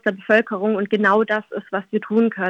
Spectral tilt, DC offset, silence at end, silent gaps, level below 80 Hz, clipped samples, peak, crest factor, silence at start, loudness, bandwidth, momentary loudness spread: -7.5 dB/octave; under 0.1%; 0 s; none; -78 dBFS; under 0.1%; -2 dBFS; 16 dB; 0.05 s; -20 LUFS; 7.2 kHz; 8 LU